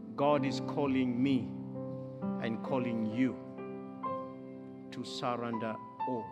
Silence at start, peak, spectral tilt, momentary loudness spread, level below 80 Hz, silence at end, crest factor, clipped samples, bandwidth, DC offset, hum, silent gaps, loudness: 0 s; -16 dBFS; -7 dB/octave; 13 LU; -76 dBFS; 0 s; 18 dB; under 0.1%; 9.4 kHz; under 0.1%; none; none; -35 LUFS